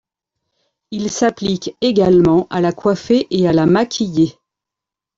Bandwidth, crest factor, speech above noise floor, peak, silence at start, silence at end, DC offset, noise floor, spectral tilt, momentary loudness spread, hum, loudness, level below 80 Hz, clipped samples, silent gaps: 7.8 kHz; 14 dB; 71 dB; -2 dBFS; 0.9 s; 0.85 s; under 0.1%; -85 dBFS; -6 dB/octave; 9 LU; none; -16 LUFS; -48 dBFS; under 0.1%; none